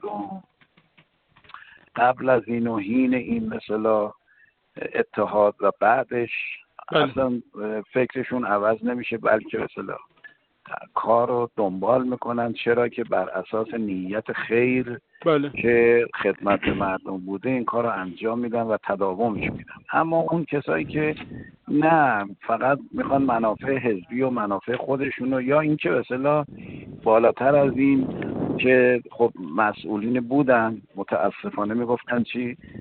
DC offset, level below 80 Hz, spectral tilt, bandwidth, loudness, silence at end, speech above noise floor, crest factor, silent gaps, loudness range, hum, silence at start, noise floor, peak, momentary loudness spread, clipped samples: under 0.1%; -56 dBFS; -11 dB/octave; 4.4 kHz; -23 LUFS; 0 s; 38 dB; 18 dB; none; 4 LU; none; 0.05 s; -61 dBFS; -4 dBFS; 11 LU; under 0.1%